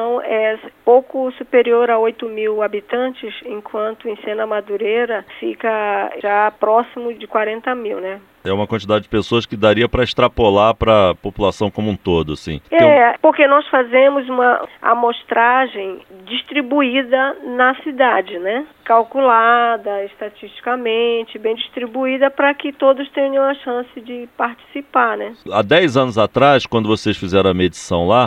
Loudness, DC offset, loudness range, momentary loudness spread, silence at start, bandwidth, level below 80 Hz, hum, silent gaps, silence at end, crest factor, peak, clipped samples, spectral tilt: -16 LUFS; under 0.1%; 6 LU; 12 LU; 0 s; 10 kHz; -42 dBFS; none; none; 0 s; 16 dB; 0 dBFS; under 0.1%; -6 dB/octave